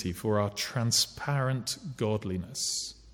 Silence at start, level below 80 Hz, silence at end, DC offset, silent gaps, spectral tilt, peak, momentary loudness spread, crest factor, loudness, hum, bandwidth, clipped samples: 0 s; -58 dBFS; 0 s; under 0.1%; none; -4 dB/octave; -14 dBFS; 7 LU; 18 dB; -30 LUFS; none; 19 kHz; under 0.1%